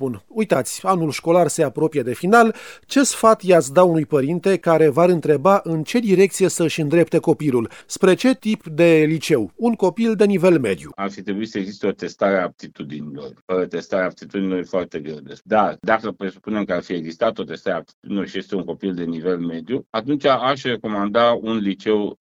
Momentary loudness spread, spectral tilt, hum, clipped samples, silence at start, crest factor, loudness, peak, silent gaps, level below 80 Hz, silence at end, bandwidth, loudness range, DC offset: 12 LU; -5.5 dB/octave; none; under 0.1%; 0 s; 18 dB; -19 LUFS; 0 dBFS; 13.42-13.48 s, 17.94-18.02 s, 19.86-19.93 s; -60 dBFS; 0.05 s; 19.5 kHz; 8 LU; under 0.1%